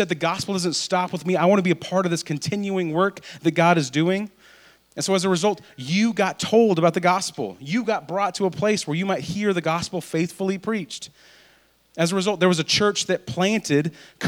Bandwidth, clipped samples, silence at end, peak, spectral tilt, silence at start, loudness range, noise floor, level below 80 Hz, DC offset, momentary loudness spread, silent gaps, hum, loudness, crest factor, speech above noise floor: 19 kHz; under 0.1%; 0 s; -4 dBFS; -4.5 dB/octave; 0 s; 3 LU; -58 dBFS; -62 dBFS; under 0.1%; 9 LU; none; none; -22 LUFS; 20 dB; 36 dB